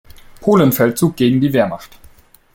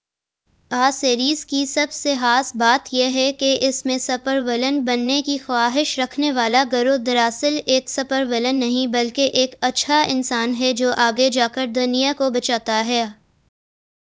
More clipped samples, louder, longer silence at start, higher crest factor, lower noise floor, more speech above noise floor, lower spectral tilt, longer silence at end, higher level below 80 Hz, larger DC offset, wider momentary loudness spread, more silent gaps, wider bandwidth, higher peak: neither; first, -15 LUFS vs -19 LUFS; second, 0.4 s vs 0.7 s; second, 14 dB vs 20 dB; second, -45 dBFS vs -73 dBFS; second, 31 dB vs 54 dB; first, -6.5 dB/octave vs -2 dB/octave; second, 0.7 s vs 0.95 s; first, -48 dBFS vs -62 dBFS; neither; first, 9 LU vs 4 LU; neither; first, 17 kHz vs 8 kHz; about the same, -2 dBFS vs 0 dBFS